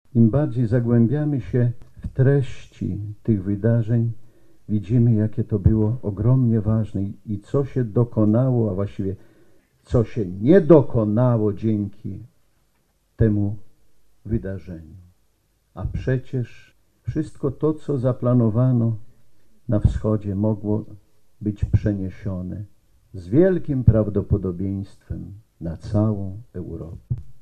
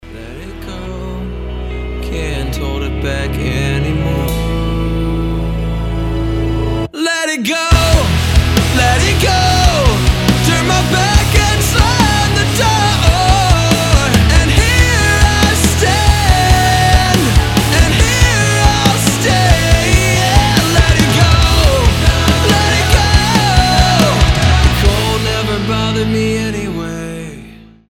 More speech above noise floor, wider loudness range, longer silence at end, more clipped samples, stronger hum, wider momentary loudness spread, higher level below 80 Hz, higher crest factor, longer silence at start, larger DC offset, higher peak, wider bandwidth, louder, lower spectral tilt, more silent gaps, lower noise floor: first, 45 dB vs 19 dB; about the same, 8 LU vs 7 LU; second, 0 s vs 0.35 s; neither; neither; first, 16 LU vs 10 LU; second, -40 dBFS vs -16 dBFS; first, 20 dB vs 12 dB; about the same, 0.15 s vs 0.05 s; neither; about the same, 0 dBFS vs 0 dBFS; second, 4.7 kHz vs 17.5 kHz; second, -22 LUFS vs -12 LUFS; first, -10.5 dB/octave vs -4.5 dB/octave; neither; first, -66 dBFS vs -36 dBFS